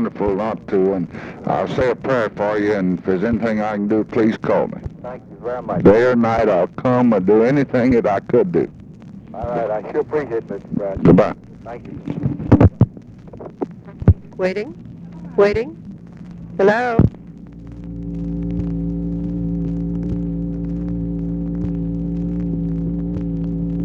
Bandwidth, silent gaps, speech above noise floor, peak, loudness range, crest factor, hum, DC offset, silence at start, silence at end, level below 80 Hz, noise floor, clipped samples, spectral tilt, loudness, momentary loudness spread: 7.2 kHz; none; 20 dB; 0 dBFS; 7 LU; 18 dB; none; under 0.1%; 0 s; 0 s; -34 dBFS; -37 dBFS; under 0.1%; -9 dB/octave; -19 LUFS; 19 LU